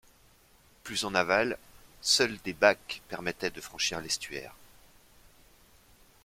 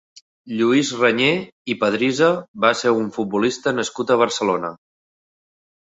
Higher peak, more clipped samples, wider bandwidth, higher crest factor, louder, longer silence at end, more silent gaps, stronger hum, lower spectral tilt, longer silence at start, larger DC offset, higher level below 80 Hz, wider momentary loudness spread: second, -6 dBFS vs -2 dBFS; neither; first, 16.5 kHz vs 8 kHz; first, 26 dB vs 18 dB; second, -29 LUFS vs -19 LUFS; first, 1.7 s vs 1.1 s; second, none vs 1.52-1.65 s, 2.48-2.54 s; neither; second, -2 dB/octave vs -4.5 dB/octave; first, 0.85 s vs 0.45 s; neither; about the same, -62 dBFS vs -64 dBFS; first, 15 LU vs 7 LU